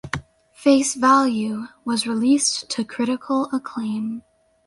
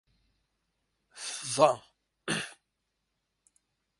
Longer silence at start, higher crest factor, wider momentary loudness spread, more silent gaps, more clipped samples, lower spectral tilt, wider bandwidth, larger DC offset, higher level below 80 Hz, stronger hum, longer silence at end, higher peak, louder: second, 0.05 s vs 1.15 s; second, 18 dB vs 26 dB; second, 13 LU vs 17 LU; neither; neither; about the same, -3.5 dB/octave vs -3 dB/octave; about the same, 11.5 kHz vs 11.5 kHz; neither; first, -56 dBFS vs -74 dBFS; neither; second, 0.45 s vs 1.45 s; first, -4 dBFS vs -8 dBFS; first, -21 LUFS vs -30 LUFS